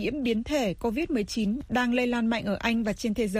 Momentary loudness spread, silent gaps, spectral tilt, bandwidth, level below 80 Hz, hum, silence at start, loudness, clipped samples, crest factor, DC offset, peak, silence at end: 3 LU; none; -5 dB/octave; 15.5 kHz; -48 dBFS; none; 0 s; -27 LUFS; under 0.1%; 16 dB; under 0.1%; -12 dBFS; 0 s